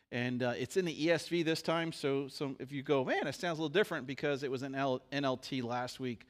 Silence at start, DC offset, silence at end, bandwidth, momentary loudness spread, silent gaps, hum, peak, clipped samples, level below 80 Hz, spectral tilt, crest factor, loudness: 0.1 s; under 0.1%; 0.1 s; 15.5 kHz; 6 LU; none; none; -18 dBFS; under 0.1%; -74 dBFS; -5 dB/octave; 18 dB; -35 LUFS